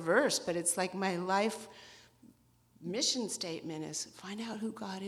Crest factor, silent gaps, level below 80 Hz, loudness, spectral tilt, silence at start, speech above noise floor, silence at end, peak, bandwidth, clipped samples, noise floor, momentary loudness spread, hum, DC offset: 20 dB; none; -76 dBFS; -34 LUFS; -3 dB/octave; 0 s; 32 dB; 0 s; -16 dBFS; 15.5 kHz; under 0.1%; -67 dBFS; 14 LU; none; under 0.1%